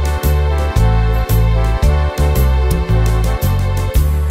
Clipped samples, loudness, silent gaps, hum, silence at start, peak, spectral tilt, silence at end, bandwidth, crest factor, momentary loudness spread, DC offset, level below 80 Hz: under 0.1%; -15 LUFS; none; none; 0 s; -2 dBFS; -6.5 dB/octave; 0 s; 16.5 kHz; 12 dB; 2 LU; under 0.1%; -14 dBFS